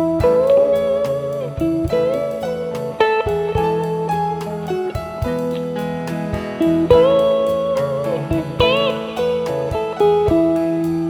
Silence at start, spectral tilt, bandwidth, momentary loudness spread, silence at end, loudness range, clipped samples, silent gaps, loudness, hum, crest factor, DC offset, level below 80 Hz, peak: 0 s; -7 dB/octave; 18 kHz; 10 LU; 0 s; 4 LU; under 0.1%; none; -18 LUFS; none; 18 dB; under 0.1%; -38 dBFS; 0 dBFS